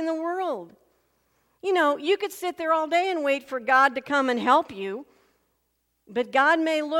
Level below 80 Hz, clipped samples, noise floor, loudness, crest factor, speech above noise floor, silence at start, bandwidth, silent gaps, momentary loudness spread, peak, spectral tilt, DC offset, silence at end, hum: -74 dBFS; under 0.1%; -74 dBFS; -24 LUFS; 20 dB; 50 dB; 0 s; 16.5 kHz; none; 13 LU; -6 dBFS; -3.5 dB/octave; under 0.1%; 0 s; none